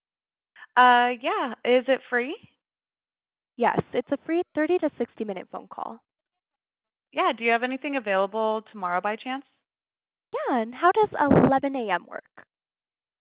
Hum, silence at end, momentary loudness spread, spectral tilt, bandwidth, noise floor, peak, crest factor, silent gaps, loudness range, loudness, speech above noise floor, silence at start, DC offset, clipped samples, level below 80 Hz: none; 0.8 s; 17 LU; -9.5 dB/octave; 4 kHz; under -90 dBFS; -6 dBFS; 20 dB; none; 5 LU; -24 LUFS; over 66 dB; 0.6 s; under 0.1%; under 0.1%; -58 dBFS